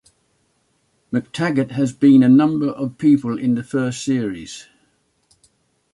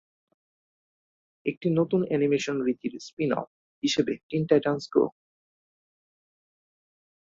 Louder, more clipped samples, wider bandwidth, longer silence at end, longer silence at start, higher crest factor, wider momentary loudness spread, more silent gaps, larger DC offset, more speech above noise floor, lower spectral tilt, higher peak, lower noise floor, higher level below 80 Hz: first, -18 LUFS vs -27 LUFS; neither; first, 11.5 kHz vs 7.8 kHz; second, 1.3 s vs 2.1 s; second, 1.1 s vs 1.45 s; second, 16 dB vs 22 dB; first, 14 LU vs 10 LU; second, none vs 1.57-1.61 s, 3.13-3.17 s, 3.47-3.82 s, 4.23-4.29 s; neither; second, 48 dB vs over 64 dB; about the same, -6.5 dB/octave vs -6 dB/octave; first, -4 dBFS vs -8 dBFS; second, -65 dBFS vs under -90 dBFS; first, -60 dBFS vs -68 dBFS